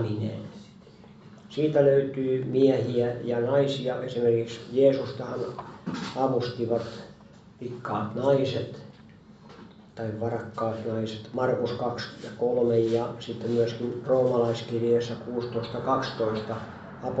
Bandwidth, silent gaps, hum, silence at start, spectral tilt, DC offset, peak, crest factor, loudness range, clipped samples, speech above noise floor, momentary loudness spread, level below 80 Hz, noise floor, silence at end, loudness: 8 kHz; none; none; 0 s; -7.5 dB/octave; under 0.1%; -8 dBFS; 18 dB; 6 LU; under 0.1%; 24 dB; 14 LU; -64 dBFS; -51 dBFS; 0 s; -27 LUFS